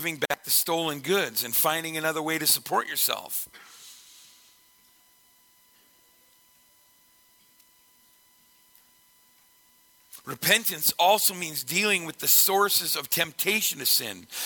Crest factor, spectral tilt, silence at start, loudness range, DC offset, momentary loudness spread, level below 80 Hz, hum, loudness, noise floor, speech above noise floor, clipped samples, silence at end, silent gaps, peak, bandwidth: 22 dB; -1 dB/octave; 0 s; 10 LU; under 0.1%; 11 LU; -72 dBFS; none; -23 LUFS; -61 dBFS; 35 dB; under 0.1%; 0 s; none; -8 dBFS; 18 kHz